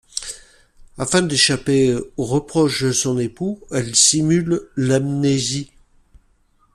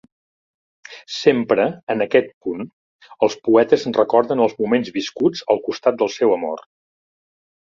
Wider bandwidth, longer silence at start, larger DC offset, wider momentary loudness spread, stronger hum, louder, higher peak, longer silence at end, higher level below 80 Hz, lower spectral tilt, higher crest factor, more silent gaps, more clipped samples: first, 14 kHz vs 7.4 kHz; second, 0.15 s vs 0.9 s; neither; about the same, 14 LU vs 12 LU; neither; about the same, -18 LUFS vs -19 LUFS; about the same, 0 dBFS vs -2 dBFS; about the same, 1.1 s vs 1.1 s; first, -48 dBFS vs -62 dBFS; second, -3.5 dB/octave vs -5.5 dB/octave; about the same, 18 dB vs 18 dB; second, none vs 1.83-1.87 s, 2.34-2.41 s, 2.73-2.99 s; neither